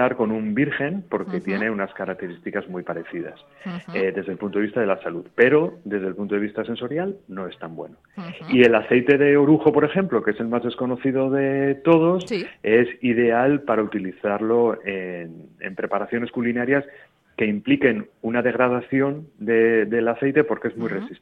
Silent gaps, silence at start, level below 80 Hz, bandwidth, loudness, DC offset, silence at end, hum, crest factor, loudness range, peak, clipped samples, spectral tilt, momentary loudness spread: none; 0 s; -62 dBFS; 7.8 kHz; -21 LUFS; under 0.1%; 0.05 s; none; 20 dB; 8 LU; -2 dBFS; under 0.1%; -8 dB/octave; 16 LU